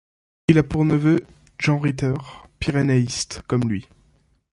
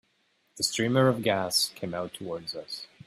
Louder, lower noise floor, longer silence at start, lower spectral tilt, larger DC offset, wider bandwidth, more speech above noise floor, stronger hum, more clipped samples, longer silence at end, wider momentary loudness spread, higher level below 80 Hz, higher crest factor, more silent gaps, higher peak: first, -21 LUFS vs -28 LUFS; second, -60 dBFS vs -71 dBFS; about the same, 0.5 s vs 0.55 s; first, -6.5 dB/octave vs -4 dB/octave; neither; second, 11.5 kHz vs 15.5 kHz; about the same, 40 dB vs 42 dB; neither; neither; first, 0.7 s vs 0.2 s; about the same, 10 LU vs 12 LU; first, -44 dBFS vs -68 dBFS; about the same, 20 dB vs 20 dB; neither; first, -2 dBFS vs -10 dBFS